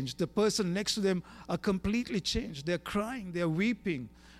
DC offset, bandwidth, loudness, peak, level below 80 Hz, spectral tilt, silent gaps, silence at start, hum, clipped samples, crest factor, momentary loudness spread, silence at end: under 0.1%; 15 kHz; -32 LUFS; -16 dBFS; -50 dBFS; -5 dB/octave; none; 0 s; none; under 0.1%; 16 dB; 7 LU; 0 s